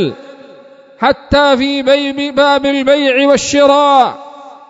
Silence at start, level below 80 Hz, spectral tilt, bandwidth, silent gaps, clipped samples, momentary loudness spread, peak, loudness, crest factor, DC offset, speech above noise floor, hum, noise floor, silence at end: 0 s; -40 dBFS; -3.5 dB/octave; 8 kHz; none; 0.2%; 7 LU; 0 dBFS; -11 LUFS; 12 dB; under 0.1%; 28 dB; none; -39 dBFS; 0.15 s